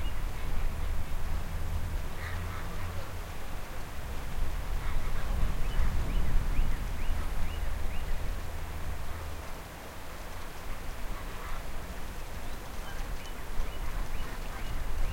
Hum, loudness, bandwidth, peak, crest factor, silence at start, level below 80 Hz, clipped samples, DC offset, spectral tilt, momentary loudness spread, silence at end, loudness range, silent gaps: none; -39 LUFS; 16.5 kHz; -14 dBFS; 16 dB; 0 s; -32 dBFS; under 0.1%; under 0.1%; -5 dB/octave; 8 LU; 0 s; 6 LU; none